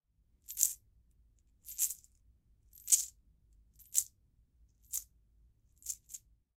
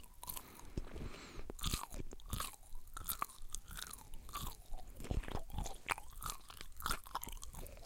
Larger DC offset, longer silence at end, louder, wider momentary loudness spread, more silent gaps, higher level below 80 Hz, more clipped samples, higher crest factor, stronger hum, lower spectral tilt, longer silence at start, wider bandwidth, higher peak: neither; first, 0.4 s vs 0 s; first, -34 LUFS vs -46 LUFS; first, 21 LU vs 10 LU; neither; second, -68 dBFS vs -48 dBFS; neither; first, 34 dB vs 28 dB; neither; second, 3 dB/octave vs -3 dB/octave; first, 0.5 s vs 0 s; about the same, 17.5 kHz vs 17 kHz; first, -6 dBFS vs -18 dBFS